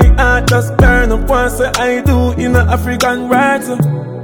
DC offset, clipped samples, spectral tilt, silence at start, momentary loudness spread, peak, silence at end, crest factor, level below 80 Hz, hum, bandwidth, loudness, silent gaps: under 0.1%; under 0.1%; -6 dB/octave; 0 s; 4 LU; 0 dBFS; 0 s; 10 dB; -16 dBFS; none; 18.5 kHz; -12 LUFS; none